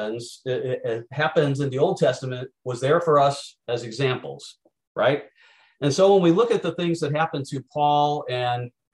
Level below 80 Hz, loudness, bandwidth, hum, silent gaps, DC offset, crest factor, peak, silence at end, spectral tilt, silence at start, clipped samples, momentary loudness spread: -68 dBFS; -23 LUFS; 12 kHz; none; 4.87-4.95 s; under 0.1%; 16 dB; -6 dBFS; 0.25 s; -6 dB/octave; 0 s; under 0.1%; 14 LU